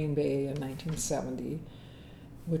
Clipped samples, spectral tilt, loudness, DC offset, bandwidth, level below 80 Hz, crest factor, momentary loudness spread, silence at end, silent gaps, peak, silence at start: under 0.1%; -6 dB/octave; -34 LUFS; under 0.1%; 18.5 kHz; -54 dBFS; 16 dB; 20 LU; 0 s; none; -18 dBFS; 0 s